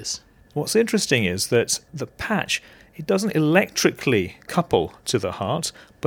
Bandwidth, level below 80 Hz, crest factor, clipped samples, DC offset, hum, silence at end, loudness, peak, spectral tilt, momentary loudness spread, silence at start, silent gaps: 19.5 kHz; -52 dBFS; 20 dB; under 0.1%; under 0.1%; none; 0 s; -22 LUFS; -2 dBFS; -4 dB/octave; 11 LU; 0 s; none